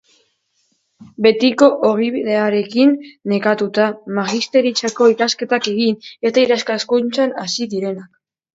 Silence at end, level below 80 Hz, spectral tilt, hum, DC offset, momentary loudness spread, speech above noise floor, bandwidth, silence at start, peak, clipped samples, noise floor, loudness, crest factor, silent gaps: 0.5 s; -64 dBFS; -4.5 dB/octave; none; under 0.1%; 8 LU; 49 dB; 8 kHz; 1 s; 0 dBFS; under 0.1%; -65 dBFS; -16 LUFS; 16 dB; none